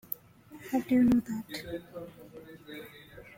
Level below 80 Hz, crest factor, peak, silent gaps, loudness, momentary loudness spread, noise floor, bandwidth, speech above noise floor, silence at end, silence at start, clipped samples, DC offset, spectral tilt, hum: -60 dBFS; 18 dB; -14 dBFS; none; -30 LUFS; 24 LU; -53 dBFS; 16.5 kHz; 22 dB; 0.1 s; 0.1 s; under 0.1%; under 0.1%; -6 dB/octave; none